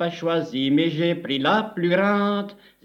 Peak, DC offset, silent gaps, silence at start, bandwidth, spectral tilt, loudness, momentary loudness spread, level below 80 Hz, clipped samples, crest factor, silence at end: -8 dBFS; under 0.1%; none; 0 s; 7.2 kHz; -7 dB/octave; -22 LUFS; 5 LU; -70 dBFS; under 0.1%; 16 dB; 0.3 s